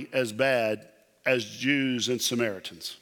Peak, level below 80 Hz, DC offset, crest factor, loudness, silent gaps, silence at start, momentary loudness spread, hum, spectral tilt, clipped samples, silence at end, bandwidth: -10 dBFS; -76 dBFS; under 0.1%; 18 dB; -27 LUFS; none; 0 s; 9 LU; none; -3.5 dB/octave; under 0.1%; 0.05 s; 19 kHz